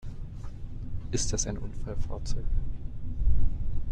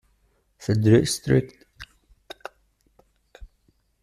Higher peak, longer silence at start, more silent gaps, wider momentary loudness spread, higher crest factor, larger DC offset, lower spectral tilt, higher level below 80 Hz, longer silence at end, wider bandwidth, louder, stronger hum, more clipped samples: second, -10 dBFS vs -6 dBFS; second, 0.05 s vs 0.6 s; neither; second, 13 LU vs 27 LU; about the same, 16 dB vs 20 dB; neither; second, -4.5 dB/octave vs -6 dB/octave; first, -32 dBFS vs -50 dBFS; second, 0 s vs 0.55 s; second, 9.2 kHz vs 14.5 kHz; second, -35 LUFS vs -21 LUFS; neither; neither